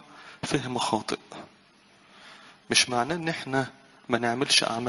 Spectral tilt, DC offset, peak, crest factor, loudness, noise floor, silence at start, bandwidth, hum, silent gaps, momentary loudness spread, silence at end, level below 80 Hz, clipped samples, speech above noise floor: -2.5 dB/octave; under 0.1%; -6 dBFS; 24 dB; -26 LUFS; -58 dBFS; 0.1 s; 11.5 kHz; none; none; 16 LU; 0 s; -62 dBFS; under 0.1%; 31 dB